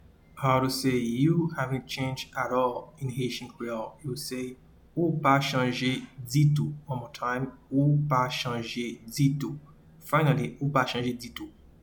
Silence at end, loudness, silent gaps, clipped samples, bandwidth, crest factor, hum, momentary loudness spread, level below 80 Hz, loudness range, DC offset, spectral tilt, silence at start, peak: 0.35 s; -28 LUFS; none; under 0.1%; 19 kHz; 18 dB; none; 12 LU; -58 dBFS; 4 LU; under 0.1%; -6 dB/octave; 0.35 s; -10 dBFS